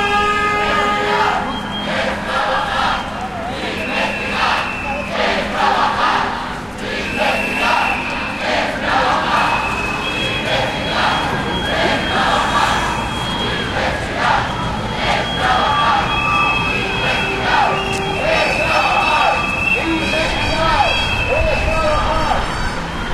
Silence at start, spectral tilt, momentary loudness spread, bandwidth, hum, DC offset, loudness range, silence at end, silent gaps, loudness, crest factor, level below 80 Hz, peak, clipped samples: 0 s; -4 dB/octave; 6 LU; 15.5 kHz; none; under 0.1%; 3 LU; 0 s; none; -16 LUFS; 16 dB; -30 dBFS; -2 dBFS; under 0.1%